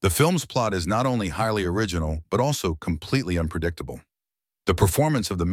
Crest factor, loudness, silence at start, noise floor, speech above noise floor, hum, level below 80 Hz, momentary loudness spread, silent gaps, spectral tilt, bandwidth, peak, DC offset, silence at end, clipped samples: 18 dB; -24 LUFS; 0 s; under -90 dBFS; over 67 dB; none; -38 dBFS; 9 LU; none; -5.5 dB/octave; 17 kHz; -6 dBFS; under 0.1%; 0 s; under 0.1%